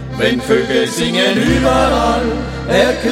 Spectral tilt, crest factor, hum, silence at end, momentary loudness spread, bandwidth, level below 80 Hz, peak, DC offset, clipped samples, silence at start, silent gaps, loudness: -4.5 dB/octave; 14 dB; none; 0 s; 4 LU; 16.5 kHz; -28 dBFS; 0 dBFS; under 0.1%; under 0.1%; 0 s; none; -14 LUFS